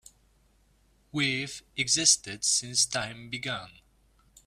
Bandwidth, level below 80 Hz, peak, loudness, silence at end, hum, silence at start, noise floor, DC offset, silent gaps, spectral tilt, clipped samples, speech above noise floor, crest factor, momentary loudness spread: 15.5 kHz; -64 dBFS; -6 dBFS; -26 LUFS; 0.75 s; none; 1.15 s; -65 dBFS; under 0.1%; none; -1 dB/octave; under 0.1%; 36 dB; 24 dB; 14 LU